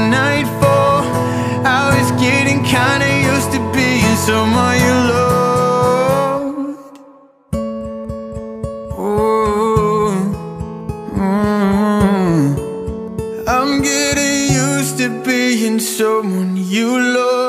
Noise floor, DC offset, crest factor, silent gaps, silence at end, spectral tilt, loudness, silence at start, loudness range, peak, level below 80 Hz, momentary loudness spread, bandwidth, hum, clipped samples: -44 dBFS; under 0.1%; 14 dB; none; 0 s; -5 dB/octave; -15 LUFS; 0 s; 5 LU; 0 dBFS; -36 dBFS; 12 LU; 15.5 kHz; none; under 0.1%